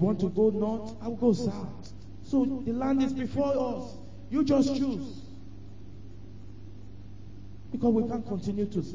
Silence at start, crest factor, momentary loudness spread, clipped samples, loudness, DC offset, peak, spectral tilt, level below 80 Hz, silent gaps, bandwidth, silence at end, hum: 0 s; 18 dB; 22 LU; under 0.1%; -29 LUFS; 0.8%; -12 dBFS; -8 dB/octave; -52 dBFS; none; 7.6 kHz; 0 s; none